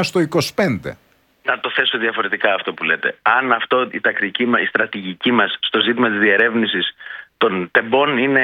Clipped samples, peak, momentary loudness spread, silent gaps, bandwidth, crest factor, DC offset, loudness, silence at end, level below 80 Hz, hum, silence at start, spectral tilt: under 0.1%; 0 dBFS; 6 LU; none; 17 kHz; 18 dB; under 0.1%; -17 LUFS; 0 s; -60 dBFS; none; 0 s; -4.5 dB/octave